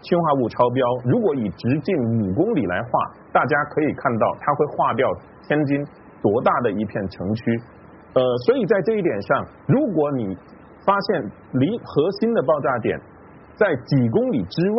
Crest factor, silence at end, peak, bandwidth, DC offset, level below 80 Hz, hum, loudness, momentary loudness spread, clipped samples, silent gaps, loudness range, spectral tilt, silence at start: 18 dB; 0 s; -4 dBFS; 5.8 kHz; under 0.1%; -56 dBFS; none; -21 LUFS; 7 LU; under 0.1%; none; 1 LU; -6.5 dB/octave; 0.05 s